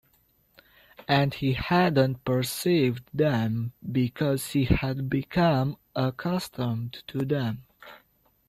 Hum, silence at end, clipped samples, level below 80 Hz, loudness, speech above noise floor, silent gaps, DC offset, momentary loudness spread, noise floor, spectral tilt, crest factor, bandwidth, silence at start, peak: none; 0.5 s; under 0.1%; -46 dBFS; -26 LUFS; 40 dB; none; under 0.1%; 8 LU; -66 dBFS; -6.5 dB/octave; 18 dB; 16 kHz; 1.1 s; -8 dBFS